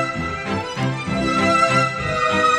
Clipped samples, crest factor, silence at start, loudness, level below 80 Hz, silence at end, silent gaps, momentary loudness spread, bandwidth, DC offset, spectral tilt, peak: under 0.1%; 14 dB; 0 s; -19 LUFS; -42 dBFS; 0 s; none; 9 LU; 12.5 kHz; under 0.1%; -5 dB/octave; -6 dBFS